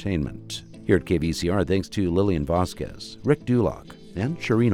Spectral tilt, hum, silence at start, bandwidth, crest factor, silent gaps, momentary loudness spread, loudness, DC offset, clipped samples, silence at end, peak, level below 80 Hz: -6.5 dB/octave; none; 0 s; 16 kHz; 18 dB; none; 13 LU; -25 LUFS; under 0.1%; under 0.1%; 0 s; -6 dBFS; -42 dBFS